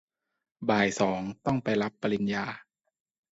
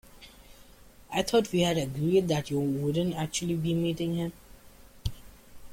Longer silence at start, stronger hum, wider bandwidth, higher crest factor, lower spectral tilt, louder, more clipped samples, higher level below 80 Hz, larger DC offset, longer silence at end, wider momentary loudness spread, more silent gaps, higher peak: first, 0.6 s vs 0.15 s; neither; second, 8 kHz vs 16.5 kHz; about the same, 20 dB vs 18 dB; about the same, -5.5 dB/octave vs -5.5 dB/octave; about the same, -29 LUFS vs -29 LUFS; neither; second, -62 dBFS vs -50 dBFS; neither; first, 0.7 s vs 0 s; second, 9 LU vs 12 LU; neither; about the same, -10 dBFS vs -12 dBFS